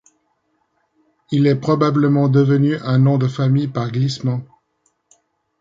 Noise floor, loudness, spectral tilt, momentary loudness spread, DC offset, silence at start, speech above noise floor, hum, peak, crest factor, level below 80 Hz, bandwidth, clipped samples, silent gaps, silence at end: -67 dBFS; -17 LUFS; -8.5 dB/octave; 8 LU; under 0.1%; 1.3 s; 51 dB; none; -4 dBFS; 16 dB; -58 dBFS; 7.6 kHz; under 0.1%; none; 1.15 s